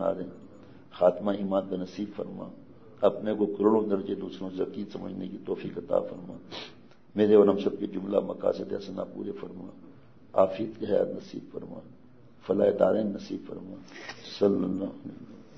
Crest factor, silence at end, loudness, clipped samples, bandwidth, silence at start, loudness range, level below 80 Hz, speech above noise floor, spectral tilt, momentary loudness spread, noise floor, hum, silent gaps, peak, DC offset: 22 dB; 0.15 s; -28 LUFS; under 0.1%; 6.4 kHz; 0 s; 4 LU; -70 dBFS; 26 dB; -8 dB/octave; 18 LU; -54 dBFS; none; none; -8 dBFS; 0.2%